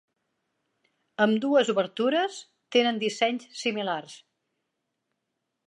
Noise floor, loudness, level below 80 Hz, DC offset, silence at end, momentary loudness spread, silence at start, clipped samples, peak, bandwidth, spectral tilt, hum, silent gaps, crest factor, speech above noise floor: -81 dBFS; -26 LUFS; -82 dBFS; under 0.1%; 1.5 s; 11 LU; 1.2 s; under 0.1%; -10 dBFS; 11 kHz; -4 dB/octave; none; none; 20 dB; 56 dB